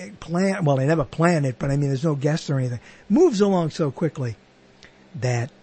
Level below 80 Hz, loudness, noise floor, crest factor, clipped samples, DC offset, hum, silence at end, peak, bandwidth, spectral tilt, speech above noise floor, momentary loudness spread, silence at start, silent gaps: -50 dBFS; -22 LUFS; -51 dBFS; 18 dB; under 0.1%; under 0.1%; none; 0.15 s; -4 dBFS; 8.8 kHz; -7 dB/octave; 29 dB; 11 LU; 0 s; none